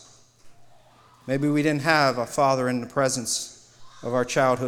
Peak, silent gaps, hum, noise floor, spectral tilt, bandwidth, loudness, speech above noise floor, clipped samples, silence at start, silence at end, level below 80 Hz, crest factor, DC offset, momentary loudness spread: -6 dBFS; none; none; -54 dBFS; -4.5 dB/octave; 17 kHz; -23 LUFS; 32 dB; under 0.1%; 0.45 s; 0 s; -62 dBFS; 20 dB; under 0.1%; 9 LU